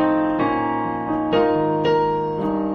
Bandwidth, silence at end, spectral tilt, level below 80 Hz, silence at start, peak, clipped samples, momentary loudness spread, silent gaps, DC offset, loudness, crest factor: 6.2 kHz; 0 s; -8.5 dB/octave; -48 dBFS; 0 s; -6 dBFS; under 0.1%; 5 LU; none; under 0.1%; -20 LUFS; 14 dB